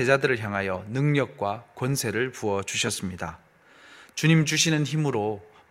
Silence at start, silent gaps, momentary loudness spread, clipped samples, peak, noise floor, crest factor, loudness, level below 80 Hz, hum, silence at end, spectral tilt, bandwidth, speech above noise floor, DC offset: 0 s; none; 11 LU; under 0.1%; -4 dBFS; -53 dBFS; 22 dB; -25 LUFS; -60 dBFS; none; 0.25 s; -4.5 dB/octave; 16 kHz; 28 dB; under 0.1%